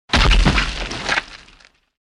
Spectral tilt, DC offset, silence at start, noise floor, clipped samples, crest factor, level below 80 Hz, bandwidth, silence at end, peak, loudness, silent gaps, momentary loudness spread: -4 dB/octave; under 0.1%; 0.1 s; -50 dBFS; under 0.1%; 16 dB; -22 dBFS; 11 kHz; 0.75 s; -2 dBFS; -18 LUFS; none; 10 LU